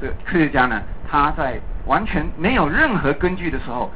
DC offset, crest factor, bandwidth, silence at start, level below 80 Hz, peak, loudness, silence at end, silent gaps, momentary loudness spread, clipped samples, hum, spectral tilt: 3%; 16 dB; 4 kHz; 0 s; -30 dBFS; -6 dBFS; -20 LUFS; 0 s; none; 9 LU; under 0.1%; none; -10 dB/octave